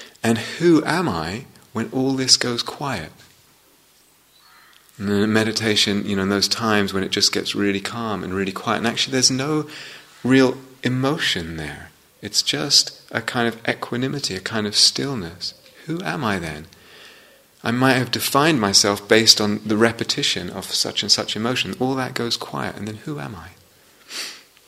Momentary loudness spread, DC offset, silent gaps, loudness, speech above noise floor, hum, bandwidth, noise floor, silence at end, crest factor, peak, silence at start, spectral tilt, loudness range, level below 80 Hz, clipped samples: 15 LU; under 0.1%; none; -19 LUFS; 35 dB; none; 16 kHz; -56 dBFS; 0.25 s; 22 dB; 0 dBFS; 0 s; -3 dB/octave; 6 LU; -56 dBFS; under 0.1%